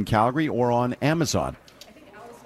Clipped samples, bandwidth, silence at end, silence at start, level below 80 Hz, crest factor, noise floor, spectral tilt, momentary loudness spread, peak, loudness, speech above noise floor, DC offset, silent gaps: under 0.1%; 14.5 kHz; 0.05 s; 0 s; -50 dBFS; 16 dB; -48 dBFS; -5.5 dB/octave; 16 LU; -8 dBFS; -23 LUFS; 25 dB; under 0.1%; none